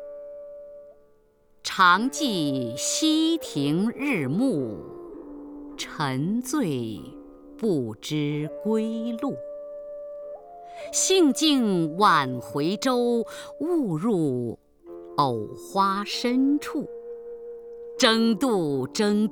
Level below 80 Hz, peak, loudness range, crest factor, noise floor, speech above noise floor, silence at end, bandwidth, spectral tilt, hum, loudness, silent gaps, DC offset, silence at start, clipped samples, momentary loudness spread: -62 dBFS; -6 dBFS; 7 LU; 20 dB; -59 dBFS; 36 dB; 0 s; over 20 kHz; -4 dB/octave; none; -24 LUFS; none; under 0.1%; 0 s; under 0.1%; 21 LU